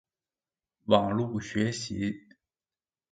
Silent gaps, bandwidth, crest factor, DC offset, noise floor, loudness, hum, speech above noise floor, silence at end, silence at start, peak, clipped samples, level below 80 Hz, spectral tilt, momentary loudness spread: none; 9.4 kHz; 26 dB; under 0.1%; under -90 dBFS; -29 LUFS; none; over 62 dB; 0.9 s; 0.85 s; -6 dBFS; under 0.1%; -60 dBFS; -5.5 dB/octave; 13 LU